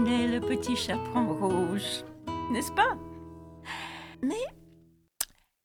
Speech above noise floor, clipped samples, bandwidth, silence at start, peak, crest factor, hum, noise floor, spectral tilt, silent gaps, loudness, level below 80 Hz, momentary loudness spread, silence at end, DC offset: 32 dB; under 0.1%; 18.5 kHz; 0 s; -10 dBFS; 22 dB; none; -60 dBFS; -4.5 dB/octave; none; -31 LUFS; -56 dBFS; 14 LU; 0.4 s; under 0.1%